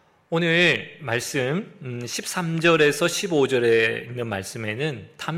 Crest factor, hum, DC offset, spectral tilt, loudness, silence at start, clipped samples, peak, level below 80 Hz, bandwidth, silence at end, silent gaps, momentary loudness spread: 18 dB; none; under 0.1%; -4.5 dB/octave; -22 LUFS; 0.3 s; under 0.1%; -6 dBFS; -64 dBFS; 16.5 kHz; 0 s; none; 12 LU